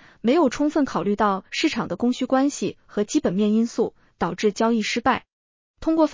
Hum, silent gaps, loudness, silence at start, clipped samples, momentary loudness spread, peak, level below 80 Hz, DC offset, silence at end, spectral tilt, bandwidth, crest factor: none; 5.33-5.74 s; -23 LUFS; 0.25 s; under 0.1%; 8 LU; -6 dBFS; -54 dBFS; under 0.1%; 0 s; -5 dB/octave; 7.6 kHz; 16 dB